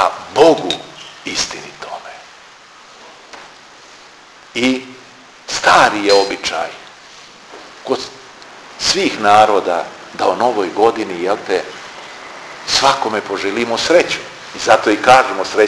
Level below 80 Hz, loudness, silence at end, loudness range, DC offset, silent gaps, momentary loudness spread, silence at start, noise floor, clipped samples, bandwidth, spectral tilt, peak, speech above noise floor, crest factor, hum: -52 dBFS; -14 LUFS; 0 s; 10 LU; under 0.1%; none; 25 LU; 0 s; -41 dBFS; under 0.1%; 11 kHz; -2.5 dB/octave; 0 dBFS; 27 dB; 16 dB; none